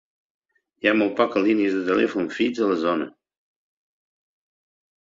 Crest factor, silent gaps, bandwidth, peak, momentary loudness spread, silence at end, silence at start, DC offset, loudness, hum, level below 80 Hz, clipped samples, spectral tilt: 20 dB; none; 7.6 kHz; -4 dBFS; 4 LU; 1.95 s; 0.85 s; under 0.1%; -22 LUFS; none; -66 dBFS; under 0.1%; -6 dB/octave